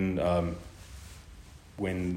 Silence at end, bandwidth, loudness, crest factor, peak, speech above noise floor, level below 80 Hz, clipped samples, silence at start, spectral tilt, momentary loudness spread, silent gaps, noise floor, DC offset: 0 s; 15.5 kHz; -31 LUFS; 16 dB; -16 dBFS; 20 dB; -50 dBFS; under 0.1%; 0 s; -7 dB/octave; 22 LU; none; -50 dBFS; under 0.1%